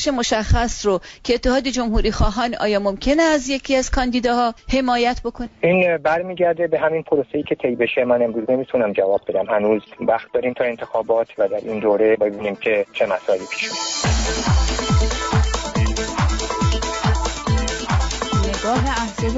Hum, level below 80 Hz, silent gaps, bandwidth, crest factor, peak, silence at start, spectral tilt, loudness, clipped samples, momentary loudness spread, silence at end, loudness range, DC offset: none; -28 dBFS; none; 8 kHz; 14 dB; -6 dBFS; 0 s; -5 dB/octave; -20 LUFS; under 0.1%; 4 LU; 0 s; 1 LU; under 0.1%